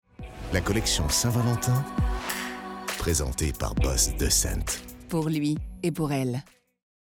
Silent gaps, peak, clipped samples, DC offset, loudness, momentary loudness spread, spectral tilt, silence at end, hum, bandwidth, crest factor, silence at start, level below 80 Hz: none; -10 dBFS; under 0.1%; under 0.1%; -27 LUFS; 10 LU; -4 dB/octave; 0.6 s; none; 19 kHz; 18 dB; 0.2 s; -34 dBFS